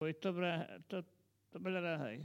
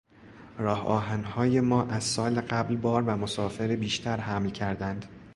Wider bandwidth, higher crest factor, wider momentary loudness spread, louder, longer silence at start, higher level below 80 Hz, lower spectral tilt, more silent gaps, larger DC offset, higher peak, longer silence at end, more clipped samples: first, 15.5 kHz vs 11.5 kHz; about the same, 16 dB vs 18 dB; first, 11 LU vs 7 LU; second, -41 LUFS vs -28 LUFS; second, 0 s vs 0.2 s; second, -88 dBFS vs -54 dBFS; first, -7 dB/octave vs -5.5 dB/octave; neither; neither; second, -26 dBFS vs -10 dBFS; about the same, 0 s vs 0 s; neither